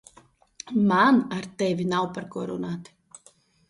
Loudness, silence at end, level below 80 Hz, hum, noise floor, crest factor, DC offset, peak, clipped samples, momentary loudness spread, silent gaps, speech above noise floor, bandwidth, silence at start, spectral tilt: -24 LUFS; 0.85 s; -66 dBFS; none; -59 dBFS; 18 dB; under 0.1%; -8 dBFS; under 0.1%; 15 LU; none; 35 dB; 11.5 kHz; 0.65 s; -6 dB/octave